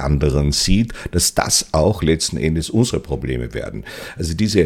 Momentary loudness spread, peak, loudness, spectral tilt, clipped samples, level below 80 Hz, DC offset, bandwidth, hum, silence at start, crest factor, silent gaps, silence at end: 11 LU; -2 dBFS; -18 LUFS; -4.5 dB/octave; under 0.1%; -28 dBFS; under 0.1%; 17.5 kHz; none; 0 s; 16 dB; none; 0 s